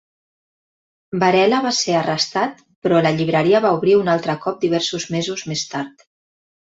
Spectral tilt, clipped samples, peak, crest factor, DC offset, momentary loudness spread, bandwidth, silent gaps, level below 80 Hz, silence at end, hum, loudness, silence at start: -4.5 dB/octave; under 0.1%; -2 dBFS; 16 dB; under 0.1%; 10 LU; 8 kHz; 2.76-2.82 s; -62 dBFS; 0.85 s; none; -18 LUFS; 1.1 s